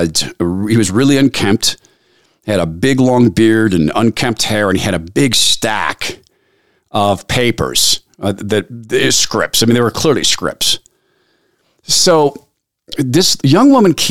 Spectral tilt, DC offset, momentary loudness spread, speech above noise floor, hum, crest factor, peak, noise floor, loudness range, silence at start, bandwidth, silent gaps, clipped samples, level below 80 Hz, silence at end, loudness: -4 dB/octave; 2%; 9 LU; 47 dB; none; 12 dB; 0 dBFS; -59 dBFS; 2 LU; 0 s; 16.5 kHz; none; under 0.1%; -40 dBFS; 0 s; -12 LUFS